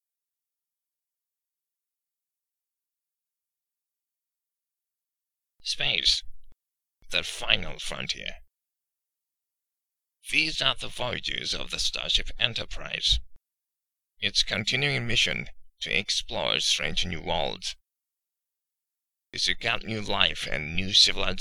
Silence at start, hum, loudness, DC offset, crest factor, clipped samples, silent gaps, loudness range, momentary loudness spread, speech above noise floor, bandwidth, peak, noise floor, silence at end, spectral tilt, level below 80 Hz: 5.6 s; none; -26 LUFS; under 0.1%; 28 dB; under 0.1%; none; 6 LU; 11 LU; 62 dB; 15 kHz; -2 dBFS; -89 dBFS; 0 s; -2 dB/octave; -42 dBFS